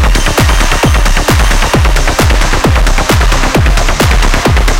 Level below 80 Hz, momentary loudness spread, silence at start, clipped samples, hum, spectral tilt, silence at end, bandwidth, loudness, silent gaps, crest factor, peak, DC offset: -10 dBFS; 1 LU; 0 s; under 0.1%; none; -4 dB/octave; 0 s; 17 kHz; -9 LUFS; none; 6 dB; 0 dBFS; under 0.1%